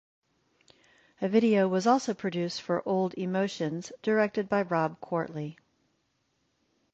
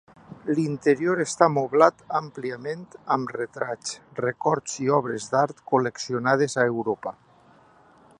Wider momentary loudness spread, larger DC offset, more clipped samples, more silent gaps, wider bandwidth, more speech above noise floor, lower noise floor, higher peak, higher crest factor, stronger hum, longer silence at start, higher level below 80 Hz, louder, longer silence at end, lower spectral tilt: second, 10 LU vs 13 LU; neither; neither; neither; second, 8.2 kHz vs 11 kHz; first, 47 dB vs 31 dB; first, -75 dBFS vs -55 dBFS; second, -10 dBFS vs -2 dBFS; about the same, 20 dB vs 24 dB; neither; first, 1.2 s vs 0.3 s; about the same, -72 dBFS vs -68 dBFS; second, -29 LUFS vs -24 LUFS; first, 1.4 s vs 1.1 s; about the same, -6 dB/octave vs -5 dB/octave